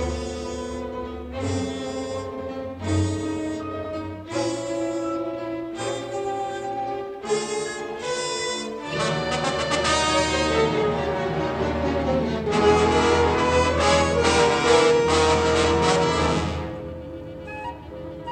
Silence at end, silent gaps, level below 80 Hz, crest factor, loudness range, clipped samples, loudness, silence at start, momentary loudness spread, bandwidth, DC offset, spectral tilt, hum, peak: 0 s; none; -40 dBFS; 18 dB; 10 LU; under 0.1%; -23 LUFS; 0 s; 13 LU; 11 kHz; under 0.1%; -4.5 dB/octave; none; -6 dBFS